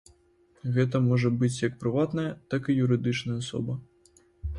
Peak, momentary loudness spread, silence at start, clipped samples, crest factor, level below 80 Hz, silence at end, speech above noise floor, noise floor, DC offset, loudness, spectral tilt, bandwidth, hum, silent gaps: -12 dBFS; 10 LU; 0.65 s; under 0.1%; 16 dB; -48 dBFS; 0 s; 37 dB; -63 dBFS; under 0.1%; -27 LUFS; -7 dB/octave; 11 kHz; none; none